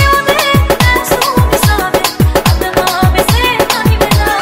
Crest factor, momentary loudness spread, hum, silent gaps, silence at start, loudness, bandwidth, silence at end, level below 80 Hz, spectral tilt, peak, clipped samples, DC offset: 10 dB; 2 LU; none; none; 0 s; -10 LUFS; 16.5 kHz; 0 s; -18 dBFS; -4.5 dB/octave; 0 dBFS; under 0.1%; under 0.1%